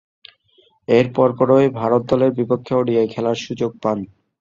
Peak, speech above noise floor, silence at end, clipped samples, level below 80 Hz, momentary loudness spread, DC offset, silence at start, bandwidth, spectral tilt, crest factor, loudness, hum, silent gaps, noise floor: -2 dBFS; 40 dB; 0.35 s; under 0.1%; -56 dBFS; 9 LU; under 0.1%; 0.9 s; 7.4 kHz; -7.5 dB/octave; 18 dB; -18 LUFS; none; none; -58 dBFS